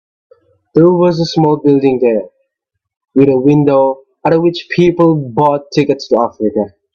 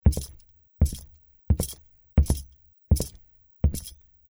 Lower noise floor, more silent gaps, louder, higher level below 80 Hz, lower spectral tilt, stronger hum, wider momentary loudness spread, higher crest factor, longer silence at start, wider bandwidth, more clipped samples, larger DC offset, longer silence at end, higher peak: first, -75 dBFS vs -54 dBFS; first, 2.97-3.01 s vs none; first, -12 LUFS vs -28 LUFS; second, -52 dBFS vs -30 dBFS; first, -8 dB/octave vs -6.5 dB/octave; neither; second, 7 LU vs 17 LU; second, 12 dB vs 22 dB; first, 0.75 s vs 0.05 s; second, 7.2 kHz vs over 20 kHz; neither; neither; second, 0.25 s vs 0.4 s; first, 0 dBFS vs -6 dBFS